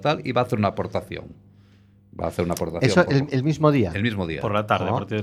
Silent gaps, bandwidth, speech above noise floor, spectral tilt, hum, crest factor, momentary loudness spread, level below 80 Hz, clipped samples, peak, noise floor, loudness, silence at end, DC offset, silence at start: none; 14.5 kHz; 31 dB; -6.5 dB/octave; none; 20 dB; 10 LU; -50 dBFS; under 0.1%; -2 dBFS; -54 dBFS; -23 LUFS; 0 s; under 0.1%; 0 s